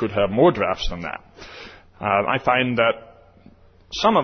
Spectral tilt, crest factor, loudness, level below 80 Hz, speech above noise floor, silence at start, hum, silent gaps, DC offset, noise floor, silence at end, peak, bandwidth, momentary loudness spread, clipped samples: -5.5 dB/octave; 18 dB; -20 LUFS; -42 dBFS; 30 dB; 0 s; none; none; under 0.1%; -50 dBFS; 0 s; -4 dBFS; 6.6 kHz; 21 LU; under 0.1%